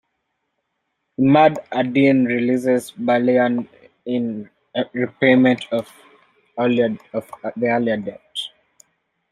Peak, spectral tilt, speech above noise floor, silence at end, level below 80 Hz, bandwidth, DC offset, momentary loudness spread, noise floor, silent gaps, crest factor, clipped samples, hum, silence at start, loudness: -2 dBFS; -6.5 dB/octave; 56 dB; 0.85 s; -62 dBFS; 12.5 kHz; under 0.1%; 16 LU; -74 dBFS; none; 18 dB; under 0.1%; none; 1.2 s; -19 LUFS